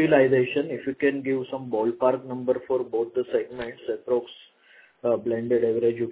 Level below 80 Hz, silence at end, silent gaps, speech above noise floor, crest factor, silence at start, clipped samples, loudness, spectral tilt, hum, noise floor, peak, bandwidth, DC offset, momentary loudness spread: -64 dBFS; 0 s; none; 32 dB; 18 dB; 0 s; under 0.1%; -25 LUFS; -10.5 dB/octave; none; -56 dBFS; -6 dBFS; 4 kHz; under 0.1%; 9 LU